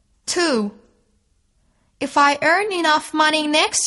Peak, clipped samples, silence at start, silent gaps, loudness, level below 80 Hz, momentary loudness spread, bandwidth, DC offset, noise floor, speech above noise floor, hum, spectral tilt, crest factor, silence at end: -2 dBFS; under 0.1%; 0.25 s; none; -18 LUFS; -62 dBFS; 9 LU; 11.5 kHz; under 0.1%; -63 dBFS; 45 dB; none; -1.5 dB/octave; 18 dB; 0 s